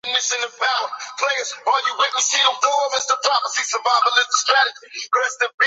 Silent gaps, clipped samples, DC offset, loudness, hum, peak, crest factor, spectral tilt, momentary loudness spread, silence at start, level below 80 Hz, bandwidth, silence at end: 5.54-5.58 s; under 0.1%; under 0.1%; -18 LUFS; none; -2 dBFS; 18 dB; 4 dB/octave; 6 LU; 0.05 s; -80 dBFS; 8.4 kHz; 0 s